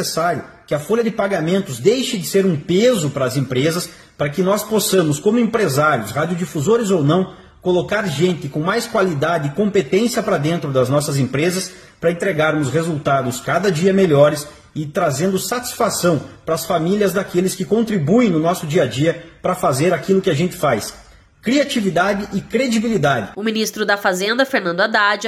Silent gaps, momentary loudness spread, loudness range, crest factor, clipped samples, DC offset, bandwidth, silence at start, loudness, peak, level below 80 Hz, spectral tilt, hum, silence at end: none; 7 LU; 1 LU; 16 dB; under 0.1%; under 0.1%; 15.5 kHz; 0 s; -18 LUFS; 0 dBFS; -52 dBFS; -5 dB/octave; none; 0 s